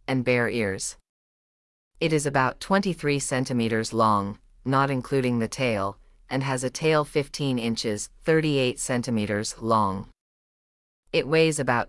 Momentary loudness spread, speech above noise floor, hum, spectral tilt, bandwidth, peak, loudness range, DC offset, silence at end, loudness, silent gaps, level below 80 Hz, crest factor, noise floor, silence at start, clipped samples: 7 LU; over 66 dB; none; -5 dB/octave; 12 kHz; -8 dBFS; 2 LU; under 0.1%; 0 s; -25 LUFS; 1.09-1.91 s, 10.21-11.03 s; -54 dBFS; 18 dB; under -90 dBFS; 0.1 s; under 0.1%